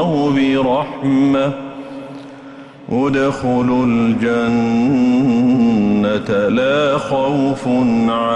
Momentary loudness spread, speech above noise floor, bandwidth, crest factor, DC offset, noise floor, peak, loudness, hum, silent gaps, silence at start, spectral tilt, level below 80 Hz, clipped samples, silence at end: 16 LU; 21 dB; 8.8 kHz; 10 dB; under 0.1%; -36 dBFS; -4 dBFS; -15 LUFS; none; none; 0 s; -7 dB/octave; -46 dBFS; under 0.1%; 0 s